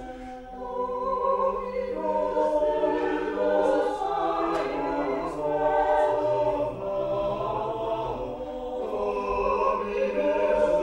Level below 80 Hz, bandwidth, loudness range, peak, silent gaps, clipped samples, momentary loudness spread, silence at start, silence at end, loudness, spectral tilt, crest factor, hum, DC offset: -48 dBFS; 10.5 kHz; 3 LU; -10 dBFS; none; under 0.1%; 9 LU; 0 s; 0 s; -26 LUFS; -6.5 dB/octave; 16 dB; none; under 0.1%